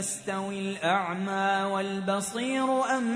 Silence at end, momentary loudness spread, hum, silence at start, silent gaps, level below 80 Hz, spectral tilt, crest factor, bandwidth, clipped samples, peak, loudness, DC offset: 0 s; 5 LU; none; 0 s; none; -72 dBFS; -4 dB/octave; 16 dB; 11 kHz; under 0.1%; -12 dBFS; -28 LUFS; under 0.1%